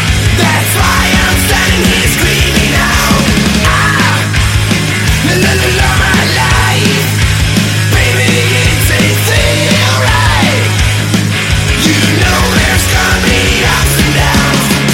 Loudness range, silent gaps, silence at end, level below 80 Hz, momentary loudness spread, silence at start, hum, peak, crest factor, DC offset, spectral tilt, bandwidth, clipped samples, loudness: 1 LU; none; 0 s; -18 dBFS; 2 LU; 0 s; none; 0 dBFS; 8 dB; under 0.1%; -4 dB/octave; 17 kHz; under 0.1%; -9 LUFS